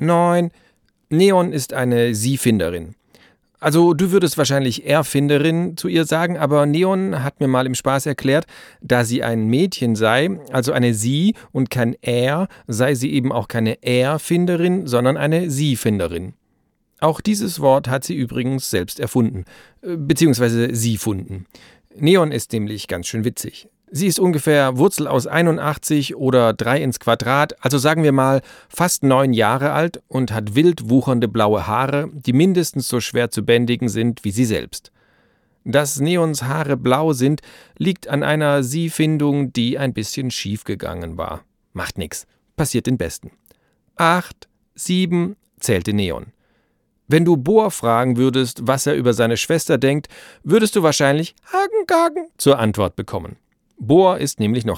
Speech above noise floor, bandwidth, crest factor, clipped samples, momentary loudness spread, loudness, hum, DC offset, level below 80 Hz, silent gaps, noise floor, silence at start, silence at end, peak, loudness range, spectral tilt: 48 dB; 18.5 kHz; 18 dB; under 0.1%; 11 LU; -18 LUFS; none; under 0.1%; -50 dBFS; none; -65 dBFS; 0 s; 0 s; -2 dBFS; 4 LU; -5.5 dB/octave